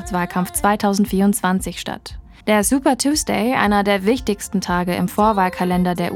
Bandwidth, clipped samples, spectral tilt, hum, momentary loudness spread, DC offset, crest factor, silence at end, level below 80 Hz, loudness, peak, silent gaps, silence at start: 18 kHz; under 0.1%; -4.5 dB/octave; none; 7 LU; under 0.1%; 18 dB; 0 s; -38 dBFS; -18 LUFS; 0 dBFS; none; 0 s